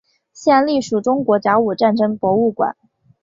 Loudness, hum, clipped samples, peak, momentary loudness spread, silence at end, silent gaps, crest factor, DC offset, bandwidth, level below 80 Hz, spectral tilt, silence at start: -17 LUFS; none; under 0.1%; -2 dBFS; 5 LU; 0.5 s; none; 16 dB; under 0.1%; 7.8 kHz; -60 dBFS; -6 dB/octave; 0.4 s